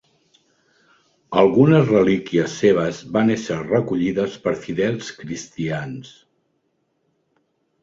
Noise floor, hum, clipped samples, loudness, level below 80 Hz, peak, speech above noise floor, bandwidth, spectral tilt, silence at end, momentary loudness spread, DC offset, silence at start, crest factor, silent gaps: -69 dBFS; none; under 0.1%; -19 LUFS; -56 dBFS; -2 dBFS; 50 dB; 7.8 kHz; -6.5 dB/octave; 1.75 s; 15 LU; under 0.1%; 1.3 s; 18 dB; none